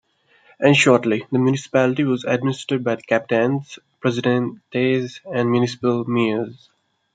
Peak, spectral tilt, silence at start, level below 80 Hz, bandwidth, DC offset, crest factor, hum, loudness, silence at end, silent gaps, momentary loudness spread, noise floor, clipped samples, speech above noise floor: -2 dBFS; -6 dB/octave; 0.6 s; -66 dBFS; 9.4 kHz; under 0.1%; 18 dB; none; -20 LUFS; 0.6 s; none; 9 LU; -56 dBFS; under 0.1%; 36 dB